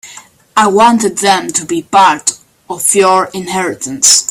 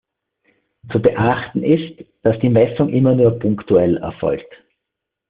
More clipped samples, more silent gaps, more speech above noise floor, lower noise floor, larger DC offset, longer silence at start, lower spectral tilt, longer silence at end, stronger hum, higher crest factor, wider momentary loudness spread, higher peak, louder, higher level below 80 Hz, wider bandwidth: first, 0.2% vs under 0.1%; neither; second, 26 dB vs 65 dB; second, -37 dBFS vs -81 dBFS; neither; second, 0.05 s vs 0.85 s; second, -2 dB/octave vs -7.5 dB/octave; second, 0.05 s vs 0.9 s; neither; about the same, 12 dB vs 16 dB; about the same, 9 LU vs 8 LU; about the same, 0 dBFS vs -2 dBFS; first, -10 LUFS vs -17 LUFS; about the same, -54 dBFS vs -50 dBFS; first, over 20 kHz vs 4.8 kHz